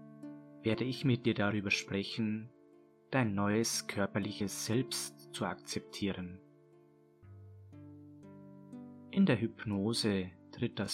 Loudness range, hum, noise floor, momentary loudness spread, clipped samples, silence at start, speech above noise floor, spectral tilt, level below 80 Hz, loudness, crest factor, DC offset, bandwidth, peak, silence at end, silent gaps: 10 LU; none; -63 dBFS; 22 LU; under 0.1%; 0 s; 29 dB; -5 dB/octave; -70 dBFS; -35 LUFS; 20 dB; under 0.1%; 16 kHz; -16 dBFS; 0 s; none